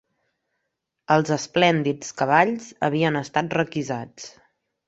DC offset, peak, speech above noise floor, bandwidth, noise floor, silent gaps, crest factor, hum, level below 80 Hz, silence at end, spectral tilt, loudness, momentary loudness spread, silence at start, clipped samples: under 0.1%; -2 dBFS; 57 dB; 8.2 kHz; -79 dBFS; none; 22 dB; none; -64 dBFS; 0.6 s; -5 dB/octave; -22 LUFS; 12 LU; 1.1 s; under 0.1%